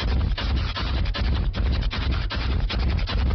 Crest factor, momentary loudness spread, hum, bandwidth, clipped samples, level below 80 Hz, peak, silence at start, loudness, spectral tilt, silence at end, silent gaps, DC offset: 10 dB; 1 LU; none; 6.2 kHz; under 0.1%; -24 dBFS; -14 dBFS; 0 s; -26 LUFS; -4.5 dB/octave; 0 s; none; under 0.1%